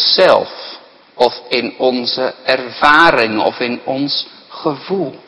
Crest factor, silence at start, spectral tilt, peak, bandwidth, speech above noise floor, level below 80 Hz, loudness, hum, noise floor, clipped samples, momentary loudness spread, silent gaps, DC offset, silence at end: 14 dB; 0 s; -4.5 dB/octave; 0 dBFS; 11 kHz; 23 dB; -50 dBFS; -14 LUFS; none; -37 dBFS; 0.3%; 13 LU; none; under 0.1%; 0.1 s